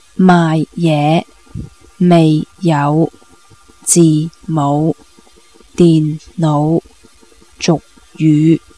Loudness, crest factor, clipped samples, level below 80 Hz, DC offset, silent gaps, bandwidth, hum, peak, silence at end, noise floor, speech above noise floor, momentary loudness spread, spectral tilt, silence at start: -13 LUFS; 14 dB; 0.1%; -46 dBFS; 0.4%; none; 11 kHz; none; 0 dBFS; 0.2 s; -46 dBFS; 35 dB; 11 LU; -6 dB/octave; 0.2 s